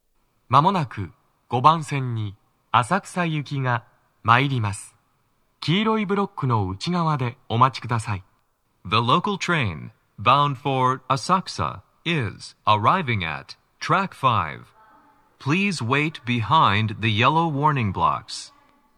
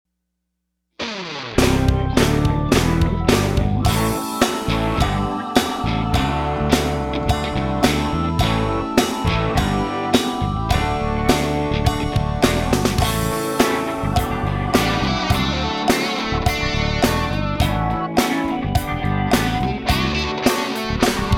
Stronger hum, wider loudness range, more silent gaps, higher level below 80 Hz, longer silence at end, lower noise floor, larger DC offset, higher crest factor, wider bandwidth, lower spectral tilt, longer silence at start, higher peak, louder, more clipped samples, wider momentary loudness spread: neither; about the same, 3 LU vs 2 LU; neither; second, -58 dBFS vs -28 dBFS; first, 0.5 s vs 0 s; second, -67 dBFS vs -76 dBFS; neither; about the same, 22 dB vs 18 dB; second, 11.5 kHz vs 17.5 kHz; about the same, -5.5 dB/octave vs -5 dB/octave; second, 0.5 s vs 1 s; about the same, 0 dBFS vs -2 dBFS; second, -22 LUFS vs -19 LUFS; neither; first, 13 LU vs 4 LU